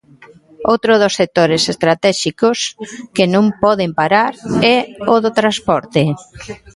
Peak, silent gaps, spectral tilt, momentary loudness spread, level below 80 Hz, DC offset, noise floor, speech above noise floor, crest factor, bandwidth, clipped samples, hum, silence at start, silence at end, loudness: 0 dBFS; none; -4.5 dB/octave; 9 LU; -50 dBFS; under 0.1%; -44 dBFS; 29 dB; 14 dB; 11.5 kHz; under 0.1%; none; 0.6 s; 0.2 s; -14 LUFS